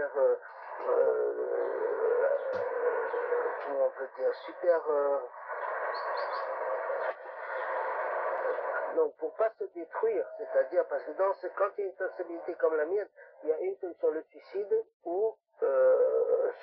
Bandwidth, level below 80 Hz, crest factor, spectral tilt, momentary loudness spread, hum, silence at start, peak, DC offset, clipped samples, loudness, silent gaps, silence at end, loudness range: 5.2 kHz; under -90 dBFS; 16 dB; -1.5 dB/octave; 9 LU; none; 0 s; -14 dBFS; under 0.1%; under 0.1%; -31 LUFS; 14.94-15.00 s; 0 s; 3 LU